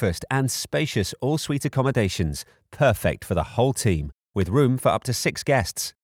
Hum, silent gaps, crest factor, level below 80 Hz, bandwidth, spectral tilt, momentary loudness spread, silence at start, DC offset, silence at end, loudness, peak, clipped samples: none; 4.14-4.18 s; 16 dB; -42 dBFS; 19 kHz; -5 dB/octave; 7 LU; 0 s; under 0.1%; 0.15 s; -24 LUFS; -8 dBFS; under 0.1%